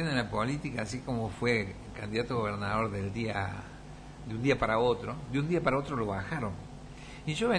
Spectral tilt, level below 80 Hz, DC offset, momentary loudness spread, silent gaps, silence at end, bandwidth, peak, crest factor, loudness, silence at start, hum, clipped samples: -6 dB/octave; -50 dBFS; under 0.1%; 16 LU; none; 0 s; 10.5 kHz; -14 dBFS; 18 dB; -32 LUFS; 0 s; none; under 0.1%